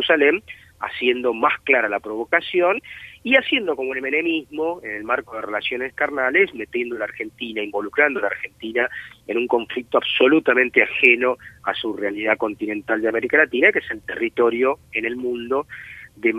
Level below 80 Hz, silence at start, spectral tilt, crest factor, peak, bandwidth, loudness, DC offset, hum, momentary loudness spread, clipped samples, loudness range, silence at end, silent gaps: -58 dBFS; 0 s; -5 dB/octave; 20 dB; 0 dBFS; 13 kHz; -20 LUFS; under 0.1%; none; 12 LU; under 0.1%; 5 LU; 0 s; none